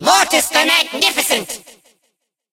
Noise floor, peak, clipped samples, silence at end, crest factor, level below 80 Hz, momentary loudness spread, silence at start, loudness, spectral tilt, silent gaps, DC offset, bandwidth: -69 dBFS; 0 dBFS; under 0.1%; 0.95 s; 18 dB; -56 dBFS; 12 LU; 0 s; -13 LUFS; 0 dB/octave; none; under 0.1%; 16 kHz